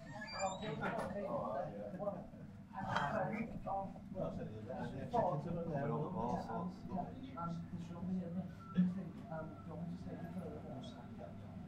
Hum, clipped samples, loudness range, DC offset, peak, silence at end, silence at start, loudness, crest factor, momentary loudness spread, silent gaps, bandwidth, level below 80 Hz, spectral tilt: none; under 0.1%; 2 LU; under 0.1%; -20 dBFS; 0 s; 0 s; -43 LUFS; 22 dB; 11 LU; none; 11.5 kHz; -62 dBFS; -7 dB/octave